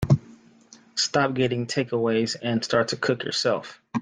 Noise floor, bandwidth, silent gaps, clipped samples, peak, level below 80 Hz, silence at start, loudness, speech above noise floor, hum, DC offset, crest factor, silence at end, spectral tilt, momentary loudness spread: -53 dBFS; 10 kHz; none; under 0.1%; -8 dBFS; -54 dBFS; 0 s; -25 LUFS; 28 dB; none; under 0.1%; 18 dB; 0 s; -5 dB/octave; 4 LU